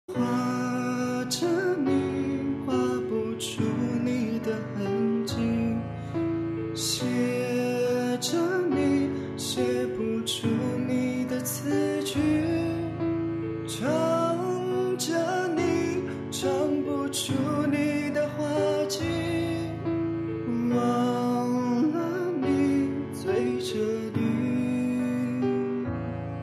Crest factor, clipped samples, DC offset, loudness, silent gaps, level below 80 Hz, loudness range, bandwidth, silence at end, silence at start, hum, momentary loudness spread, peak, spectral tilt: 12 dB; under 0.1%; under 0.1%; -27 LUFS; none; -56 dBFS; 2 LU; 14 kHz; 0 s; 0.1 s; none; 5 LU; -14 dBFS; -5.5 dB/octave